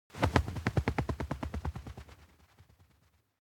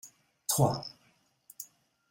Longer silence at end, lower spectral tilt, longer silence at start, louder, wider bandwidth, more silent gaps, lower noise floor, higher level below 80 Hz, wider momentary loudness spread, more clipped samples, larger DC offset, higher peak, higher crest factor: first, 1.15 s vs 0.45 s; first, -6.5 dB/octave vs -5 dB/octave; about the same, 0.15 s vs 0.05 s; second, -34 LUFS vs -30 LUFS; about the same, 17.5 kHz vs 16.5 kHz; neither; about the same, -70 dBFS vs -69 dBFS; first, -44 dBFS vs -66 dBFS; about the same, 19 LU vs 19 LU; neither; neither; first, -6 dBFS vs -12 dBFS; first, 30 dB vs 24 dB